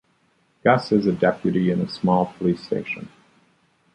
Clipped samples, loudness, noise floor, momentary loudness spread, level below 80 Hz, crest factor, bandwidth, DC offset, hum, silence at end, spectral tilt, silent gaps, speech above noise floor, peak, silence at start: under 0.1%; -22 LUFS; -64 dBFS; 10 LU; -56 dBFS; 20 dB; 9.4 kHz; under 0.1%; none; 0.85 s; -8 dB/octave; none; 43 dB; -2 dBFS; 0.65 s